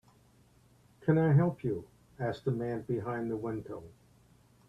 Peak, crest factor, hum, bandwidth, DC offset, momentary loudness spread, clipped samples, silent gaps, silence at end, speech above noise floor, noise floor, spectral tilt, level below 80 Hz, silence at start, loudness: -14 dBFS; 20 dB; none; 5.8 kHz; under 0.1%; 14 LU; under 0.1%; none; 0.8 s; 33 dB; -64 dBFS; -10 dB/octave; -64 dBFS; 1 s; -32 LUFS